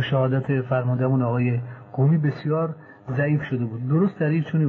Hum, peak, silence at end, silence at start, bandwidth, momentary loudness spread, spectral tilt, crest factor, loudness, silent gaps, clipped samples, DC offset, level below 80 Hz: none; -10 dBFS; 0 s; 0 s; 4.3 kHz; 8 LU; -10.5 dB/octave; 14 dB; -23 LUFS; none; under 0.1%; under 0.1%; -58 dBFS